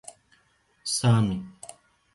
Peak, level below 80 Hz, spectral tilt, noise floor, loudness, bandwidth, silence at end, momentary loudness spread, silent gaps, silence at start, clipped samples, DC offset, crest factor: -12 dBFS; -56 dBFS; -5 dB/octave; -66 dBFS; -25 LUFS; 12 kHz; 0.65 s; 23 LU; none; 0.85 s; under 0.1%; under 0.1%; 16 dB